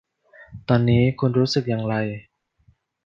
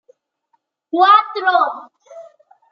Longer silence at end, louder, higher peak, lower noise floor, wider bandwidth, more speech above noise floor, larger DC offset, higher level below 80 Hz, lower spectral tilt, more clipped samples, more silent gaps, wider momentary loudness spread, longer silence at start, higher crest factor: first, 0.85 s vs 0.5 s; second, -21 LUFS vs -14 LUFS; about the same, -4 dBFS vs -2 dBFS; second, -61 dBFS vs -67 dBFS; first, 7.4 kHz vs 6.6 kHz; second, 41 dB vs 53 dB; neither; first, -50 dBFS vs -84 dBFS; first, -7.5 dB/octave vs -2.5 dB/octave; neither; neither; about the same, 13 LU vs 13 LU; second, 0.4 s vs 0.95 s; about the same, 18 dB vs 16 dB